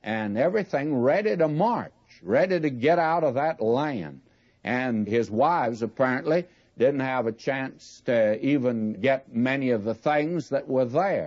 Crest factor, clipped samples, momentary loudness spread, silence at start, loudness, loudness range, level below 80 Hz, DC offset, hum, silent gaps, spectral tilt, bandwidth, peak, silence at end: 14 dB; under 0.1%; 7 LU; 0.05 s; -25 LUFS; 2 LU; -70 dBFS; under 0.1%; none; none; -7.5 dB/octave; 7.6 kHz; -10 dBFS; 0 s